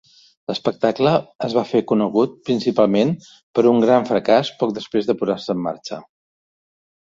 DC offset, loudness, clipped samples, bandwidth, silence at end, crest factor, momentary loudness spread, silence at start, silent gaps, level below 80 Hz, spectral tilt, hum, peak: under 0.1%; -19 LUFS; under 0.1%; 7.6 kHz; 1.15 s; 18 dB; 11 LU; 0.5 s; 1.35-1.39 s, 3.43-3.54 s; -62 dBFS; -7 dB/octave; none; -2 dBFS